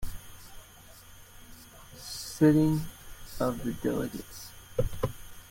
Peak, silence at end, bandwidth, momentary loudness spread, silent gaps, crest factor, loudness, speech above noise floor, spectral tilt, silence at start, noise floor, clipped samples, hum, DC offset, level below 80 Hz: -10 dBFS; 0 s; 16.5 kHz; 27 LU; none; 22 dB; -30 LUFS; 25 dB; -6.5 dB/octave; 0 s; -52 dBFS; under 0.1%; none; under 0.1%; -46 dBFS